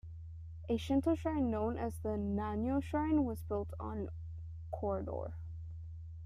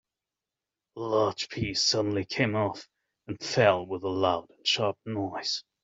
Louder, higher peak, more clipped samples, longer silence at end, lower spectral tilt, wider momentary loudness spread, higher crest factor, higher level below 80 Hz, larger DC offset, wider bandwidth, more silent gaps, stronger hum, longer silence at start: second, -37 LUFS vs -28 LUFS; second, -22 dBFS vs -8 dBFS; neither; second, 0 s vs 0.25 s; first, -8 dB/octave vs -4 dB/octave; first, 15 LU vs 9 LU; second, 16 dB vs 22 dB; first, -52 dBFS vs -62 dBFS; neither; first, 14.5 kHz vs 8.2 kHz; neither; neither; second, 0.05 s vs 0.95 s